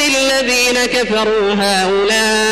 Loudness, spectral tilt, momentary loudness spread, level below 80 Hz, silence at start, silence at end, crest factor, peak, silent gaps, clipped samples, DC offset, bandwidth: -13 LUFS; -2 dB/octave; 2 LU; -40 dBFS; 0 s; 0 s; 12 dB; -2 dBFS; none; under 0.1%; under 0.1%; 15 kHz